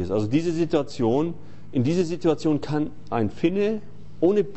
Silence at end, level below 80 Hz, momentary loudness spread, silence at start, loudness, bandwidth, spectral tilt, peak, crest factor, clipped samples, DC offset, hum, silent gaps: 0 s; -52 dBFS; 6 LU; 0 s; -24 LUFS; 8.4 kHz; -7.5 dB/octave; -8 dBFS; 16 dB; under 0.1%; 2%; none; none